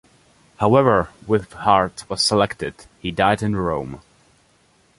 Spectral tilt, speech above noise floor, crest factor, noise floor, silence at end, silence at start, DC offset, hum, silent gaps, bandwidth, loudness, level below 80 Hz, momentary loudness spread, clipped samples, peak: -5 dB/octave; 39 dB; 20 dB; -58 dBFS; 1 s; 0.6 s; under 0.1%; none; none; 11.5 kHz; -19 LUFS; -46 dBFS; 15 LU; under 0.1%; -2 dBFS